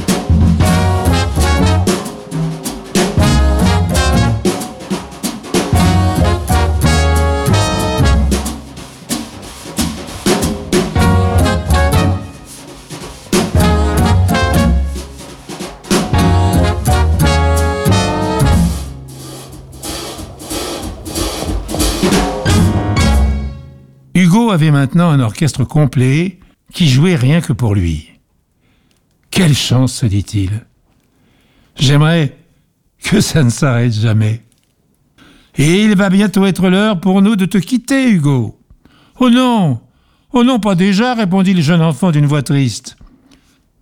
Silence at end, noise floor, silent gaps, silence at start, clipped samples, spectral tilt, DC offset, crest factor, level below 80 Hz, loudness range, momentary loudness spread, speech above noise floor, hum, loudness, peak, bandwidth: 0.75 s; -57 dBFS; none; 0 s; under 0.1%; -5.5 dB/octave; under 0.1%; 12 dB; -22 dBFS; 4 LU; 14 LU; 46 dB; none; -13 LUFS; -2 dBFS; 16.5 kHz